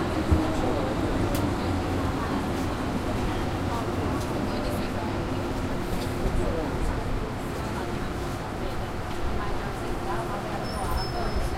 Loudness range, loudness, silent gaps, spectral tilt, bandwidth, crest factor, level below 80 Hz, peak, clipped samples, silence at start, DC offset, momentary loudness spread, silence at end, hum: 4 LU; -29 LUFS; none; -6 dB/octave; 16 kHz; 18 dB; -34 dBFS; -8 dBFS; under 0.1%; 0 s; under 0.1%; 5 LU; 0 s; none